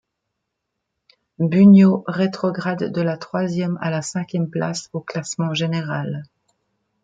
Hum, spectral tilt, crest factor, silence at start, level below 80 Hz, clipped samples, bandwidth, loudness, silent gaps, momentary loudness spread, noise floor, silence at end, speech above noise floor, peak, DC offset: none; -6.5 dB/octave; 18 dB; 1.4 s; -64 dBFS; under 0.1%; 9 kHz; -19 LUFS; none; 15 LU; -78 dBFS; 0.8 s; 60 dB; -2 dBFS; under 0.1%